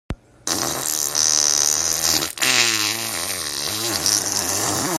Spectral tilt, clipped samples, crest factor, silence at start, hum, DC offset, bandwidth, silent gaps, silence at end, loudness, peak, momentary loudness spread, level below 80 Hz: -0.5 dB/octave; under 0.1%; 22 dB; 0.1 s; none; under 0.1%; 16 kHz; none; 0 s; -18 LUFS; 0 dBFS; 8 LU; -48 dBFS